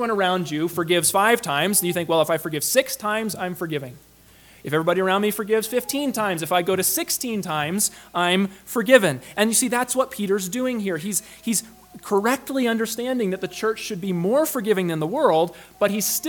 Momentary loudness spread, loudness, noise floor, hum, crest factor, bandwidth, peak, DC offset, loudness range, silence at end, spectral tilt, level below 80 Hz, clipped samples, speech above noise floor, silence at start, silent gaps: 7 LU; -22 LUFS; -51 dBFS; none; 22 dB; 19 kHz; 0 dBFS; under 0.1%; 4 LU; 0 s; -3.5 dB/octave; -62 dBFS; under 0.1%; 29 dB; 0 s; none